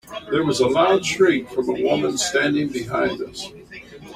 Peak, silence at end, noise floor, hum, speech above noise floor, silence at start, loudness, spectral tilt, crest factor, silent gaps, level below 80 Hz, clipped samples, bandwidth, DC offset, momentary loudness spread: -4 dBFS; 0 s; -40 dBFS; none; 20 dB; 0.05 s; -20 LUFS; -4 dB/octave; 16 dB; none; -54 dBFS; under 0.1%; 15 kHz; under 0.1%; 17 LU